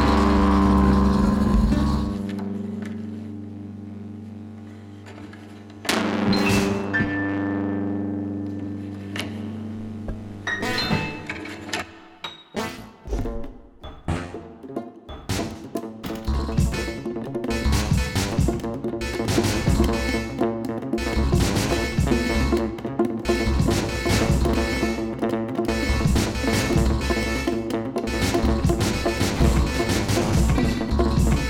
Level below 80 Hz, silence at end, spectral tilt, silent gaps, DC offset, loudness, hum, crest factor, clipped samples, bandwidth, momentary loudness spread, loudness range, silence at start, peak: -30 dBFS; 0 s; -5.5 dB/octave; none; under 0.1%; -23 LUFS; none; 16 dB; under 0.1%; 17 kHz; 16 LU; 10 LU; 0 s; -6 dBFS